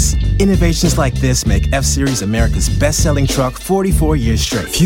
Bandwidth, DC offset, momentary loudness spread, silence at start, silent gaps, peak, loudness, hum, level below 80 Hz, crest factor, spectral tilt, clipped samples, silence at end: 17 kHz; under 0.1%; 3 LU; 0 s; none; 0 dBFS; -14 LUFS; none; -18 dBFS; 12 dB; -5 dB/octave; under 0.1%; 0 s